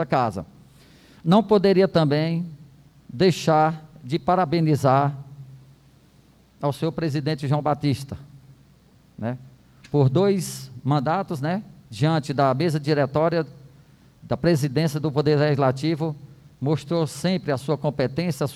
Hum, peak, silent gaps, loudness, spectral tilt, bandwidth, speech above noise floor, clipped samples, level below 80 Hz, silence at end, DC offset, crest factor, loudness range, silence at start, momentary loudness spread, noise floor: none; -6 dBFS; none; -23 LUFS; -7 dB/octave; 13.5 kHz; 33 dB; under 0.1%; -56 dBFS; 0 s; under 0.1%; 18 dB; 6 LU; 0 s; 13 LU; -55 dBFS